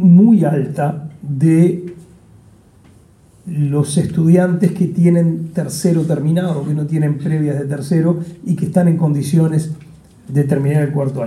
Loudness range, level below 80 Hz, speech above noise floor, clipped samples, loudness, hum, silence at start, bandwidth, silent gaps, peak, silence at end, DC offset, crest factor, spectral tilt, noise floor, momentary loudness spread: 3 LU; -54 dBFS; 32 dB; under 0.1%; -15 LUFS; none; 0 s; 12.5 kHz; none; -2 dBFS; 0 s; under 0.1%; 14 dB; -8 dB/octave; -47 dBFS; 9 LU